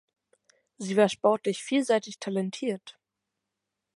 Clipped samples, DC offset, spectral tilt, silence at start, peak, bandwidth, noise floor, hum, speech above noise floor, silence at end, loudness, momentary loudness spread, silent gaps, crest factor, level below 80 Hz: under 0.1%; under 0.1%; -5 dB/octave; 0.8 s; -10 dBFS; 11.5 kHz; -85 dBFS; none; 58 dB; 1.1 s; -27 LUFS; 10 LU; none; 20 dB; -80 dBFS